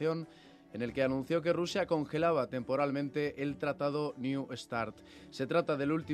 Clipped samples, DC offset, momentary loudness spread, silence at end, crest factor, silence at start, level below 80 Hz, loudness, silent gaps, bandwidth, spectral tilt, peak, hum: under 0.1%; under 0.1%; 10 LU; 0 s; 18 dB; 0 s; -66 dBFS; -34 LUFS; none; 13 kHz; -6.5 dB/octave; -16 dBFS; none